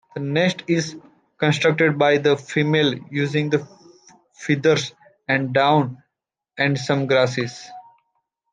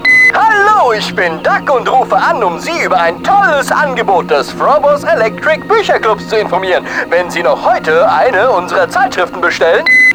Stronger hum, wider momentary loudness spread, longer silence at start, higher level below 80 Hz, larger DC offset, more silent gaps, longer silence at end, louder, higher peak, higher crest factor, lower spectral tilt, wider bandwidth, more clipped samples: neither; first, 13 LU vs 6 LU; first, 0.15 s vs 0 s; second, -66 dBFS vs -44 dBFS; neither; neither; first, 0.7 s vs 0 s; second, -20 LUFS vs -10 LUFS; about the same, -4 dBFS vs -2 dBFS; first, 18 dB vs 10 dB; first, -5.5 dB/octave vs -4 dB/octave; second, 9.4 kHz vs over 20 kHz; neither